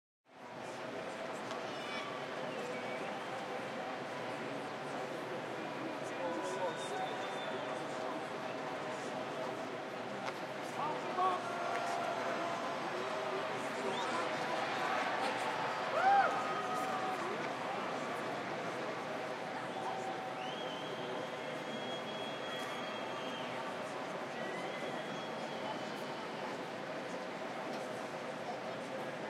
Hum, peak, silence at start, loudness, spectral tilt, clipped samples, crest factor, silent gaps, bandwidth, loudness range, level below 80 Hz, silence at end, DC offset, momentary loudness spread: none; -18 dBFS; 0.3 s; -39 LUFS; -4 dB/octave; under 0.1%; 20 dB; none; 16 kHz; 7 LU; -86 dBFS; 0 s; under 0.1%; 6 LU